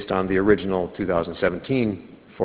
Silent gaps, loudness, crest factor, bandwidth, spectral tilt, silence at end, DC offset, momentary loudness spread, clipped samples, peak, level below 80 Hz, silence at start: none; -23 LUFS; 20 dB; 4 kHz; -11 dB/octave; 0 s; under 0.1%; 7 LU; under 0.1%; -4 dBFS; -46 dBFS; 0 s